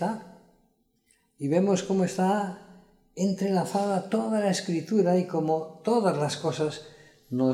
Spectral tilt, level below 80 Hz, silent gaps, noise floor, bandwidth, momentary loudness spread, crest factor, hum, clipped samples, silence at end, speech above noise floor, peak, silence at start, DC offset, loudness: -6 dB/octave; -70 dBFS; none; -69 dBFS; 13.5 kHz; 11 LU; 18 dB; none; under 0.1%; 0 s; 43 dB; -10 dBFS; 0 s; under 0.1%; -27 LUFS